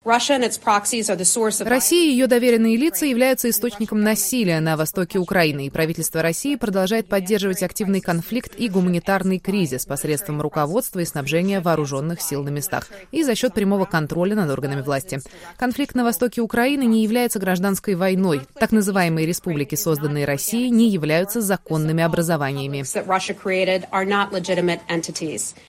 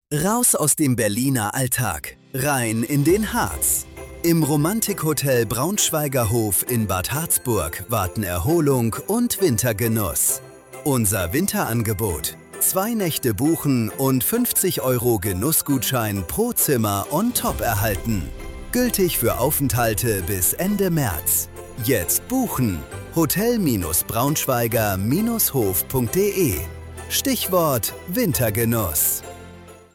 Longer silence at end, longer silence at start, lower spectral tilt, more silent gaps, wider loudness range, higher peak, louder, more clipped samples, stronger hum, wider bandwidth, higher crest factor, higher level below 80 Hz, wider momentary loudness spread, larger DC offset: about the same, 0.15 s vs 0.2 s; about the same, 0.05 s vs 0.1 s; about the same, -4.5 dB/octave vs -4.5 dB/octave; neither; first, 5 LU vs 1 LU; first, -2 dBFS vs -6 dBFS; about the same, -20 LUFS vs -20 LUFS; neither; neither; about the same, 16.5 kHz vs 17 kHz; about the same, 18 dB vs 16 dB; second, -52 dBFS vs -40 dBFS; about the same, 7 LU vs 6 LU; neither